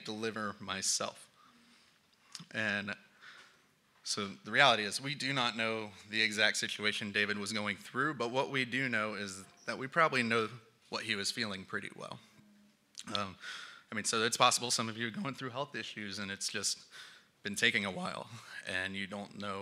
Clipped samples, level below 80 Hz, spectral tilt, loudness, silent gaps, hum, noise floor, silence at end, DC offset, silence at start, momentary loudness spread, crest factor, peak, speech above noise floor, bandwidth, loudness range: under 0.1%; -84 dBFS; -2.5 dB/octave; -34 LUFS; none; none; -69 dBFS; 0 s; under 0.1%; 0 s; 17 LU; 28 dB; -10 dBFS; 33 dB; 16 kHz; 7 LU